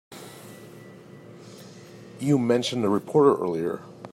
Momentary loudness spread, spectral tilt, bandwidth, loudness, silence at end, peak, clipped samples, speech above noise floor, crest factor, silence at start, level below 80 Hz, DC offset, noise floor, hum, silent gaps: 26 LU; -6.5 dB/octave; 15.5 kHz; -23 LUFS; 0.05 s; -6 dBFS; under 0.1%; 23 dB; 20 dB; 0.1 s; -72 dBFS; under 0.1%; -46 dBFS; none; none